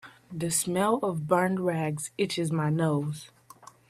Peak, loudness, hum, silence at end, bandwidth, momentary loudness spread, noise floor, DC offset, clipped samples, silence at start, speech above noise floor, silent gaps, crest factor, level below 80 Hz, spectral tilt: -8 dBFS; -28 LUFS; none; 0.6 s; 15 kHz; 9 LU; -53 dBFS; under 0.1%; under 0.1%; 0.05 s; 25 dB; none; 20 dB; -66 dBFS; -5 dB/octave